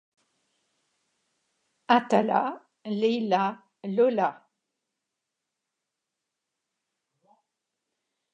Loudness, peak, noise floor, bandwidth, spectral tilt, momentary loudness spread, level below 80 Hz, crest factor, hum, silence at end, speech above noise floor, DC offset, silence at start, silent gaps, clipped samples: -26 LUFS; -6 dBFS; -85 dBFS; 9.4 kHz; -6 dB/octave; 11 LU; -86 dBFS; 26 dB; none; 4 s; 61 dB; under 0.1%; 1.9 s; none; under 0.1%